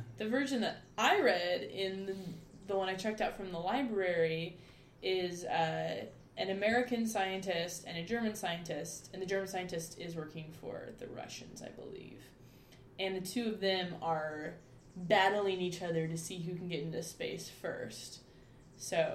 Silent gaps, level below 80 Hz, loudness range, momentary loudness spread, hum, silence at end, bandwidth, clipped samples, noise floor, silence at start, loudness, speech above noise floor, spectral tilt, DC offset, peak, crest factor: none; -66 dBFS; 8 LU; 15 LU; none; 0 s; 16 kHz; under 0.1%; -58 dBFS; 0 s; -36 LUFS; 22 dB; -4 dB/octave; under 0.1%; -14 dBFS; 22 dB